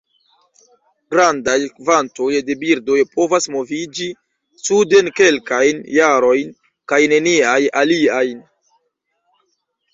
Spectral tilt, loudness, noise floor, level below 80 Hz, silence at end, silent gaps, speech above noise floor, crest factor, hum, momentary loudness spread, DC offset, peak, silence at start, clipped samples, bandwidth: -3 dB/octave; -15 LUFS; -70 dBFS; -60 dBFS; 1.55 s; none; 55 dB; 16 dB; none; 10 LU; under 0.1%; 0 dBFS; 1.1 s; under 0.1%; 7.8 kHz